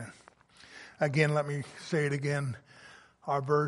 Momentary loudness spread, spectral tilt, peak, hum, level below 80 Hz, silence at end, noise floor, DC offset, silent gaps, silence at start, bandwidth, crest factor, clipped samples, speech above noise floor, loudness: 22 LU; -6.5 dB/octave; -10 dBFS; none; -70 dBFS; 0 s; -58 dBFS; under 0.1%; none; 0 s; 11.5 kHz; 22 dB; under 0.1%; 29 dB; -31 LUFS